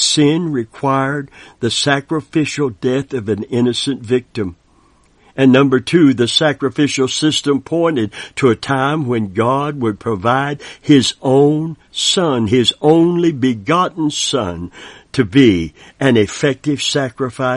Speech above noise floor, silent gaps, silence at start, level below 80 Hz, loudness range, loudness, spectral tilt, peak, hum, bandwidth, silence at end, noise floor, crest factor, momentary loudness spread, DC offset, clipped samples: 37 dB; none; 0 s; -48 dBFS; 4 LU; -15 LUFS; -5 dB/octave; 0 dBFS; none; 10.5 kHz; 0 s; -52 dBFS; 16 dB; 9 LU; under 0.1%; under 0.1%